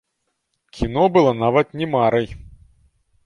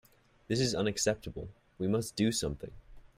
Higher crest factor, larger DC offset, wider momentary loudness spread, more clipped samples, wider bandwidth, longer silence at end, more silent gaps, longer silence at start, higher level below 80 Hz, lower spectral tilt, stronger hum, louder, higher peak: about the same, 18 dB vs 18 dB; neither; second, 10 LU vs 15 LU; neither; second, 10.5 kHz vs 16 kHz; first, 0.8 s vs 0.2 s; neither; first, 0.75 s vs 0.5 s; first, -42 dBFS vs -54 dBFS; first, -7.5 dB/octave vs -4.5 dB/octave; neither; first, -18 LUFS vs -32 LUFS; first, -2 dBFS vs -16 dBFS